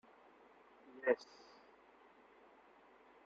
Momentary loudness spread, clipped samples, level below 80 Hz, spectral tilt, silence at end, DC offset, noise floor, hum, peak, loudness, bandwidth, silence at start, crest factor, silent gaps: 27 LU; under 0.1%; -88 dBFS; -2 dB/octave; 2.1 s; under 0.1%; -66 dBFS; none; -20 dBFS; -39 LUFS; 7.4 kHz; 0.95 s; 26 dB; none